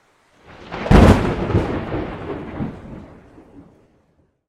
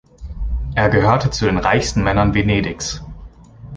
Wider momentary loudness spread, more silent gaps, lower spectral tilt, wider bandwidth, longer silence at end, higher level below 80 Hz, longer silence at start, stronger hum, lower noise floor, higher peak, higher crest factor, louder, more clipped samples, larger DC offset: first, 24 LU vs 15 LU; neither; first, -7.5 dB/octave vs -5.5 dB/octave; first, 13 kHz vs 9.8 kHz; first, 1.45 s vs 0 s; about the same, -26 dBFS vs -28 dBFS; first, 0.6 s vs 0.2 s; neither; first, -61 dBFS vs -38 dBFS; about the same, 0 dBFS vs -2 dBFS; about the same, 20 dB vs 16 dB; about the same, -18 LUFS vs -17 LUFS; first, 0.1% vs under 0.1%; neither